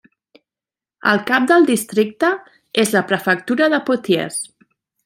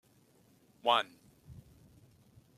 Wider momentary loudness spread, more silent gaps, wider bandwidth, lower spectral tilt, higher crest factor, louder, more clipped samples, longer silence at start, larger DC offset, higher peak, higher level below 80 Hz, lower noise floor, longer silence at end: second, 10 LU vs 26 LU; neither; about the same, 16.5 kHz vs 15 kHz; about the same, -4 dB/octave vs -3.5 dB/octave; second, 18 dB vs 26 dB; first, -17 LUFS vs -32 LUFS; neither; first, 1.05 s vs 0.85 s; neither; first, -2 dBFS vs -14 dBFS; about the same, -66 dBFS vs -70 dBFS; first, under -90 dBFS vs -66 dBFS; second, 0.6 s vs 1.05 s